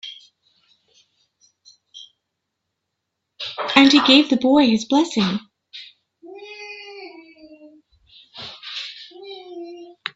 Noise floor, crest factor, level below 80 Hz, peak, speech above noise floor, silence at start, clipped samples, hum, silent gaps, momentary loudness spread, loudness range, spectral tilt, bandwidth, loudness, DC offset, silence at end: -79 dBFS; 22 dB; -64 dBFS; 0 dBFS; 63 dB; 0.05 s; under 0.1%; none; none; 27 LU; 19 LU; -4 dB/octave; 8 kHz; -17 LUFS; under 0.1%; 0.3 s